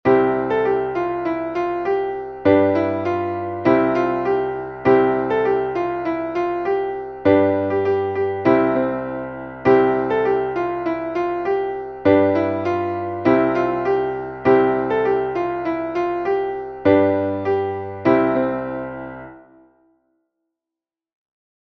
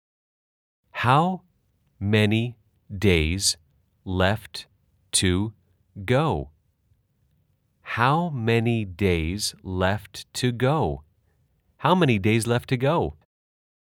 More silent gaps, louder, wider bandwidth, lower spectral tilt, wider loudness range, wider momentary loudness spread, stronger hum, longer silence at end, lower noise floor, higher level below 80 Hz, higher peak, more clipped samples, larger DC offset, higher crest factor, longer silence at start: neither; first, -20 LUFS vs -24 LUFS; second, 6.2 kHz vs 17.5 kHz; first, -8.5 dB/octave vs -5 dB/octave; about the same, 2 LU vs 3 LU; second, 8 LU vs 13 LU; neither; first, 2.35 s vs 0.9 s; first, -88 dBFS vs -67 dBFS; about the same, -52 dBFS vs -48 dBFS; about the same, -2 dBFS vs -4 dBFS; neither; neither; about the same, 18 dB vs 22 dB; second, 0.05 s vs 0.95 s